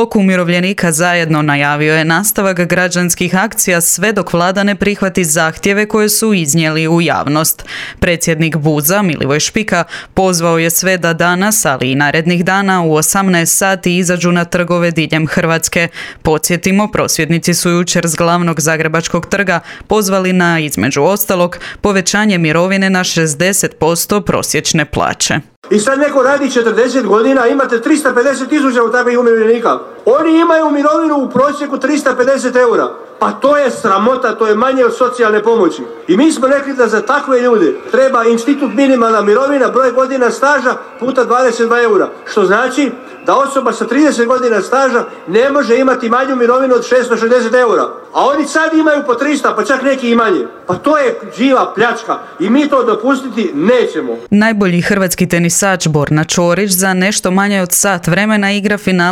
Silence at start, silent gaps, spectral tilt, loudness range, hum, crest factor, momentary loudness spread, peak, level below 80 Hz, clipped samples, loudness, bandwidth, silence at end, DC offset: 0 s; 25.56-25.62 s; -4.5 dB/octave; 2 LU; none; 12 dB; 4 LU; 0 dBFS; -42 dBFS; under 0.1%; -11 LUFS; 17 kHz; 0 s; under 0.1%